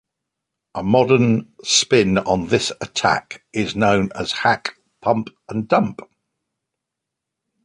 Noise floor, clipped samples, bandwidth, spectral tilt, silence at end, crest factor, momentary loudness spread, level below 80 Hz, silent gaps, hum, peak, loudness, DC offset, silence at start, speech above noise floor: -82 dBFS; under 0.1%; 11 kHz; -4 dB/octave; 1.65 s; 18 dB; 12 LU; -50 dBFS; none; none; -2 dBFS; -19 LUFS; under 0.1%; 0.75 s; 64 dB